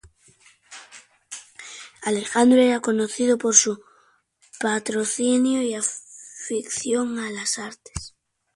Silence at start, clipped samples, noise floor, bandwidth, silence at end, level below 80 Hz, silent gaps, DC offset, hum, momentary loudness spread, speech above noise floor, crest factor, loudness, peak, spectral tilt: 0.7 s; under 0.1%; -61 dBFS; 11.5 kHz; 0.45 s; -54 dBFS; none; under 0.1%; none; 23 LU; 40 dB; 24 dB; -21 LUFS; 0 dBFS; -2.5 dB/octave